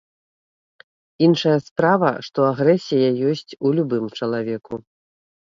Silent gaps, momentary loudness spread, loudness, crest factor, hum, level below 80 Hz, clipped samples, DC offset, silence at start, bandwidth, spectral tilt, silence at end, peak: 1.71-1.76 s; 9 LU; -20 LUFS; 18 dB; none; -64 dBFS; under 0.1%; under 0.1%; 1.2 s; 7.6 kHz; -7 dB/octave; 0.65 s; -2 dBFS